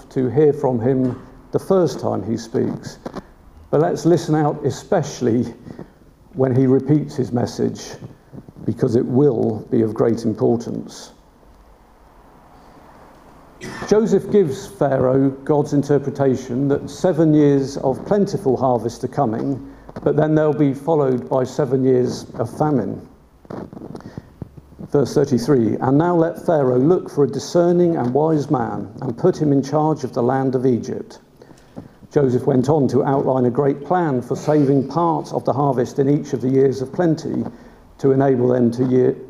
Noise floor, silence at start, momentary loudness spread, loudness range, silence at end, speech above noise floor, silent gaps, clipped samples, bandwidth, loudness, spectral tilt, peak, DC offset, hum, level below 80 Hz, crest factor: -48 dBFS; 0.1 s; 15 LU; 5 LU; 0 s; 30 dB; none; under 0.1%; 12.5 kHz; -18 LUFS; -8 dB/octave; -2 dBFS; under 0.1%; none; -52 dBFS; 18 dB